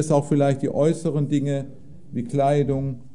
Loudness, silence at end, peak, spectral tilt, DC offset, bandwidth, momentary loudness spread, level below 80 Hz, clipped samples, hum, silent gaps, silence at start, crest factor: -22 LUFS; 0.05 s; -6 dBFS; -7.5 dB/octave; 1%; 11 kHz; 10 LU; -54 dBFS; under 0.1%; none; none; 0 s; 16 dB